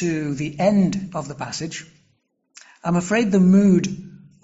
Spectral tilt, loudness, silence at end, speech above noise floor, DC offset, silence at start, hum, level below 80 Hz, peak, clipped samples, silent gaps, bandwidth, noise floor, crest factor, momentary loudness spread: -7 dB/octave; -20 LUFS; 0.3 s; 47 dB; under 0.1%; 0 s; none; -54 dBFS; -6 dBFS; under 0.1%; none; 8 kHz; -67 dBFS; 14 dB; 15 LU